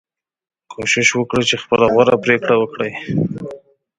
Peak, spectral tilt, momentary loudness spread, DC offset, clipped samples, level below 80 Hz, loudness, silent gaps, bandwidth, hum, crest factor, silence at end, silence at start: 0 dBFS; -4 dB/octave; 11 LU; under 0.1%; under 0.1%; -52 dBFS; -16 LUFS; none; 9.6 kHz; none; 18 dB; 0.4 s; 0.7 s